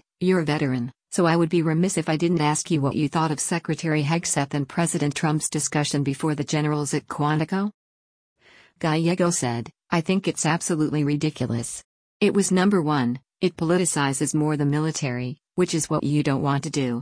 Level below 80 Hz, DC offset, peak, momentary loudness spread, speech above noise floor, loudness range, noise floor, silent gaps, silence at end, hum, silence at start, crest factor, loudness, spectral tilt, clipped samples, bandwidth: -60 dBFS; under 0.1%; -8 dBFS; 6 LU; over 67 dB; 3 LU; under -90 dBFS; 7.74-8.36 s, 11.84-12.20 s; 0 s; none; 0.2 s; 16 dB; -23 LUFS; -5 dB/octave; under 0.1%; 10.5 kHz